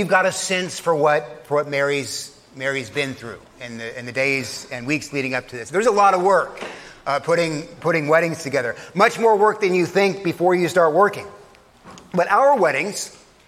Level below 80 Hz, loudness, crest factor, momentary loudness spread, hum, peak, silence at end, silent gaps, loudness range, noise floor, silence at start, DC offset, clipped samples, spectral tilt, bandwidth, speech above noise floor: -60 dBFS; -20 LUFS; 18 dB; 15 LU; none; -2 dBFS; 0.3 s; none; 6 LU; -48 dBFS; 0 s; under 0.1%; under 0.1%; -4.5 dB/octave; 16 kHz; 28 dB